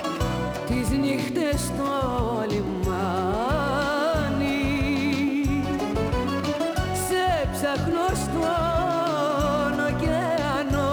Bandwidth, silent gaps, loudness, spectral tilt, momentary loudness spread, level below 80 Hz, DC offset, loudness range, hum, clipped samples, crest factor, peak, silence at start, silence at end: over 20 kHz; none; -25 LUFS; -5.5 dB/octave; 3 LU; -36 dBFS; under 0.1%; 1 LU; none; under 0.1%; 12 dB; -12 dBFS; 0 s; 0 s